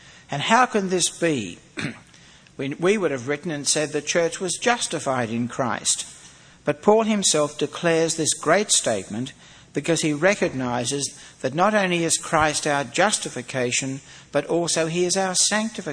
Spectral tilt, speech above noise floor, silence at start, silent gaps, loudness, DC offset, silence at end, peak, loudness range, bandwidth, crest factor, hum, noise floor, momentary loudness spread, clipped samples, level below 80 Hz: -3 dB/octave; 27 dB; 0.05 s; none; -22 LUFS; under 0.1%; 0 s; -2 dBFS; 3 LU; 11 kHz; 22 dB; none; -50 dBFS; 12 LU; under 0.1%; -58 dBFS